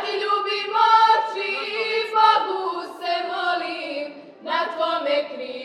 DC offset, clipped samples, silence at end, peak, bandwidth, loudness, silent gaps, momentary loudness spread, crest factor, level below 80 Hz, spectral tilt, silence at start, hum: under 0.1%; under 0.1%; 0 s; -4 dBFS; 11.5 kHz; -21 LUFS; none; 13 LU; 18 dB; -90 dBFS; -2 dB/octave; 0 s; none